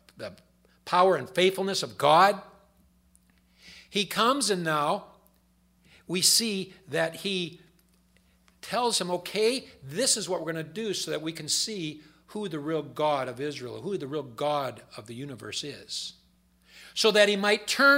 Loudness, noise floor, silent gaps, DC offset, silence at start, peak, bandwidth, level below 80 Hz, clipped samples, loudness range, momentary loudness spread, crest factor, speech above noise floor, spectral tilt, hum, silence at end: -27 LUFS; -65 dBFS; none; under 0.1%; 0.2 s; -6 dBFS; 16 kHz; -68 dBFS; under 0.1%; 6 LU; 17 LU; 22 dB; 38 dB; -2.5 dB/octave; none; 0 s